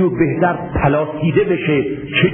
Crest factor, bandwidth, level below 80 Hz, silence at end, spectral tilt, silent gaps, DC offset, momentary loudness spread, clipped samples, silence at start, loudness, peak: 14 dB; 3.7 kHz; -36 dBFS; 0 s; -12.5 dB/octave; none; under 0.1%; 2 LU; under 0.1%; 0 s; -16 LUFS; -2 dBFS